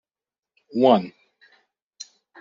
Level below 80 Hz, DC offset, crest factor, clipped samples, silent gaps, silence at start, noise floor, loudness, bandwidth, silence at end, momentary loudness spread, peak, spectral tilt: -72 dBFS; under 0.1%; 22 dB; under 0.1%; none; 0.75 s; under -90 dBFS; -20 LUFS; 7.4 kHz; 1.3 s; 24 LU; -2 dBFS; -5 dB/octave